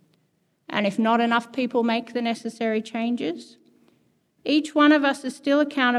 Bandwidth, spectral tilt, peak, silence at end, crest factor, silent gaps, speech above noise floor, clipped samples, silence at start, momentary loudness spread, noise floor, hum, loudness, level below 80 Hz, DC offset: 11.5 kHz; -4.5 dB/octave; -6 dBFS; 0 s; 18 dB; none; 46 dB; under 0.1%; 0.7 s; 10 LU; -68 dBFS; none; -23 LUFS; -82 dBFS; under 0.1%